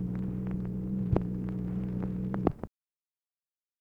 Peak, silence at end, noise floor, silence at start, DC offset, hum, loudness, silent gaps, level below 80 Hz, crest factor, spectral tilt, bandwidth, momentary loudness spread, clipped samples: -8 dBFS; 1.1 s; under -90 dBFS; 0 s; under 0.1%; none; -33 LUFS; none; -46 dBFS; 24 dB; -11 dB/octave; 3.9 kHz; 4 LU; under 0.1%